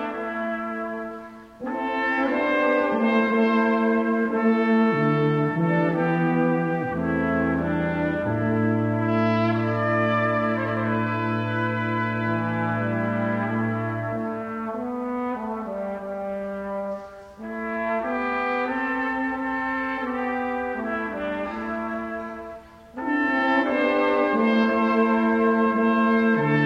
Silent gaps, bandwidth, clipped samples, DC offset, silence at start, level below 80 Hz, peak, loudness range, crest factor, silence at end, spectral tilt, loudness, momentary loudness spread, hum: none; 6.4 kHz; under 0.1%; under 0.1%; 0 s; -54 dBFS; -8 dBFS; 8 LU; 16 dB; 0 s; -8.5 dB/octave; -24 LUFS; 10 LU; none